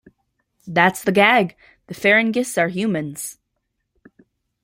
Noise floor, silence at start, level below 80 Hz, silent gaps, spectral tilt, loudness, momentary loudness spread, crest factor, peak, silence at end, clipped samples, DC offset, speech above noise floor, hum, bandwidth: -75 dBFS; 0.65 s; -62 dBFS; none; -4.5 dB/octave; -18 LUFS; 15 LU; 20 dB; 0 dBFS; 1.3 s; under 0.1%; under 0.1%; 56 dB; none; 16.5 kHz